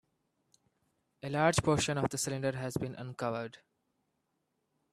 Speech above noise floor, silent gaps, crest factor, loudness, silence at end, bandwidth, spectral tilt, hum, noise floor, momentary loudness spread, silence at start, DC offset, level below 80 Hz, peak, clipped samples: 49 dB; none; 24 dB; -33 LUFS; 1.35 s; 14.5 kHz; -4.5 dB/octave; none; -81 dBFS; 12 LU; 1.25 s; under 0.1%; -62 dBFS; -12 dBFS; under 0.1%